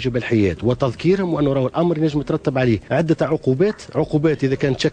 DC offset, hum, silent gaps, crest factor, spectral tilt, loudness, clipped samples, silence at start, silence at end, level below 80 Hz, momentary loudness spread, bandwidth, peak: under 0.1%; none; none; 14 dB; -7.5 dB/octave; -19 LUFS; under 0.1%; 0 s; 0 s; -44 dBFS; 2 LU; 9.4 kHz; -6 dBFS